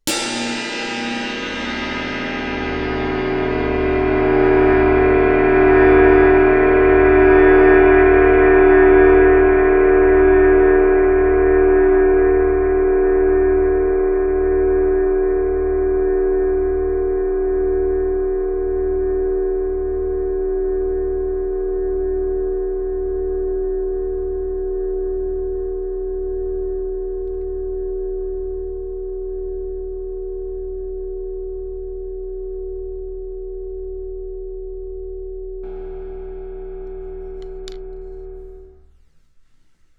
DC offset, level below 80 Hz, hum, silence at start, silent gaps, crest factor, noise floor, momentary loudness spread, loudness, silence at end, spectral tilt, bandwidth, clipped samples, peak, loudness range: under 0.1%; -28 dBFS; none; 0.05 s; none; 16 dB; -52 dBFS; 20 LU; -16 LUFS; 1.3 s; -6 dB/octave; 11 kHz; under 0.1%; 0 dBFS; 19 LU